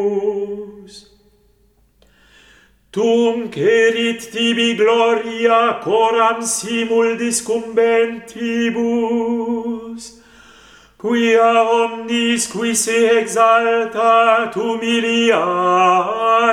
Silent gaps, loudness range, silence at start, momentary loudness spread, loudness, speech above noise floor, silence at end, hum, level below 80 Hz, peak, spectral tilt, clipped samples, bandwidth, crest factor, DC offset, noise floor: none; 6 LU; 0 s; 9 LU; -16 LUFS; 41 dB; 0 s; none; -60 dBFS; -2 dBFS; -3 dB/octave; under 0.1%; 14.5 kHz; 14 dB; under 0.1%; -56 dBFS